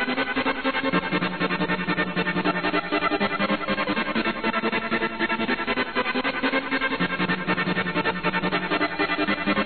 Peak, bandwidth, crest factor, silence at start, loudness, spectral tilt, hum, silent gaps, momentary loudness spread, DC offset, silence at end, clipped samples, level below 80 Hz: -10 dBFS; 4.6 kHz; 14 dB; 0 s; -24 LUFS; -8.5 dB/octave; none; none; 1 LU; 0.7%; 0 s; under 0.1%; -52 dBFS